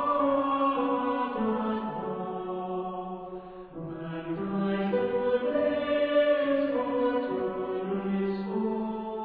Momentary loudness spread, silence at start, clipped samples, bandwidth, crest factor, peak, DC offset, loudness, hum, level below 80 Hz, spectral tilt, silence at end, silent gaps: 11 LU; 0 s; under 0.1%; 4.9 kHz; 14 dB; -14 dBFS; under 0.1%; -29 LUFS; none; -60 dBFS; -10 dB/octave; 0 s; none